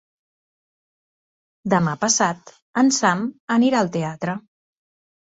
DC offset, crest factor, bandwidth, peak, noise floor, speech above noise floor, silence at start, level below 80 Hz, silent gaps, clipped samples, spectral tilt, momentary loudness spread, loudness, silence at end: under 0.1%; 20 dB; 8 kHz; -4 dBFS; under -90 dBFS; over 70 dB; 1.65 s; -64 dBFS; 2.62-2.74 s, 3.40-3.48 s; under 0.1%; -4 dB/octave; 11 LU; -20 LUFS; 0.8 s